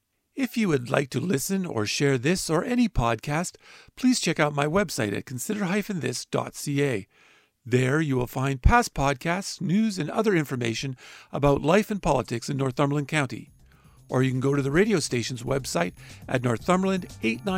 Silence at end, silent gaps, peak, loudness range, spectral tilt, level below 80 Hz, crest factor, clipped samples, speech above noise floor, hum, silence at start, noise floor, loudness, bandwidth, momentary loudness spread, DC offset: 0 s; none; -4 dBFS; 2 LU; -5.5 dB/octave; -40 dBFS; 20 dB; under 0.1%; 29 dB; none; 0.35 s; -54 dBFS; -25 LUFS; 16 kHz; 7 LU; under 0.1%